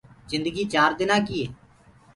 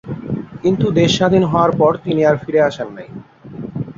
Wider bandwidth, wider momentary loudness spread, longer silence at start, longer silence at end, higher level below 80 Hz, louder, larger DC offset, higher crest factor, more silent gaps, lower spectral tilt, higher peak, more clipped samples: first, 11.5 kHz vs 7.8 kHz; second, 10 LU vs 19 LU; first, 0.3 s vs 0.05 s; first, 0.6 s vs 0.05 s; second, -54 dBFS vs -48 dBFS; second, -24 LUFS vs -15 LUFS; neither; first, 20 dB vs 14 dB; neither; second, -4.5 dB/octave vs -6.5 dB/octave; second, -6 dBFS vs -2 dBFS; neither